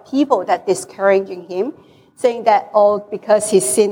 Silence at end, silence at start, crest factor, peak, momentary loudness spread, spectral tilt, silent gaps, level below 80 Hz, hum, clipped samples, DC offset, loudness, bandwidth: 0 s; 0.1 s; 14 dB; -2 dBFS; 10 LU; -4 dB/octave; none; -68 dBFS; none; under 0.1%; under 0.1%; -16 LUFS; 18.5 kHz